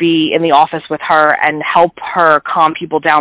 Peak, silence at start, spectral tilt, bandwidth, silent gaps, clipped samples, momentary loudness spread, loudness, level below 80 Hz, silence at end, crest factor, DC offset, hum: 0 dBFS; 0 s; -8.5 dB/octave; 4 kHz; none; under 0.1%; 4 LU; -12 LUFS; -54 dBFS; 0 s; 12 dB; under 0.1%; none